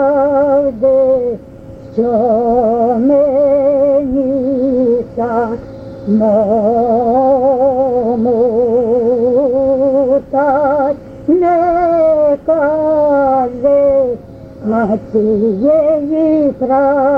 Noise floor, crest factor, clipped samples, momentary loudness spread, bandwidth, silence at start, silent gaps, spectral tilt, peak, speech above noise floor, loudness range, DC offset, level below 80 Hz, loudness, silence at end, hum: -32 dBFS; 10 dB; under 0.1%; 5 LU; 5 kHz; 0 s; none; -10 dB/octave; -2 dBFS; 21 dB; 1 LU; under 0.1%; -42 dBFS; -12 LUFS; 0 s; none